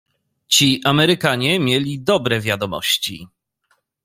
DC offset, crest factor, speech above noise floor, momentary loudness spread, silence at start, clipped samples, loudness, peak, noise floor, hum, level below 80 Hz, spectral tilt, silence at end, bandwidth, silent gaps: under 0.1%; 18 dB; 48 dB; 7 LU; 0.5 s; under 0.1%; -17 LUFS; -2 dBFS; -66 dBFS; none; -54 dBFS; -3.5 dB/octave; 0.8 s; 16 kHz; none